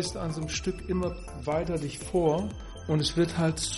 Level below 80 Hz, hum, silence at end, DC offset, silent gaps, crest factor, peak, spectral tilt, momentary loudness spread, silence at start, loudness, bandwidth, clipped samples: -44 dBFS; none; 0 s; under 0.1%; none; 16 dB; -14 dBFS; -5 dB/octave; 8 LU; 0 s; -30 LUFS; 11.5 kHz; under 0.1%